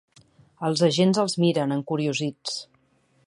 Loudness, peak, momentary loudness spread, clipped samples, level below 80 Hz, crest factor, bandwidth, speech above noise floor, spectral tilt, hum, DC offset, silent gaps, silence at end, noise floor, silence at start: -24 LUFS; -8 dBFS; 11 LU; under 0.1%; -70 dBFS; 16 dB; 11.5 kHz; 41 dB; -5.5 dB/octave; none; under 0.1%; none; 0.65 s; -65 dBFS; 0.6 s